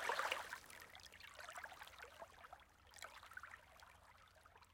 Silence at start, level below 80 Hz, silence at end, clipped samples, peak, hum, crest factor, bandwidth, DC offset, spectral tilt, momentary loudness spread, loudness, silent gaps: 0 s; -76 dBFS; 0 s; under 0.1%; -26 dBFS; none; 28 dB; 16.5 kHz; under 0.1%; -1 dB/octave; 21 LU; -51 LUFS; none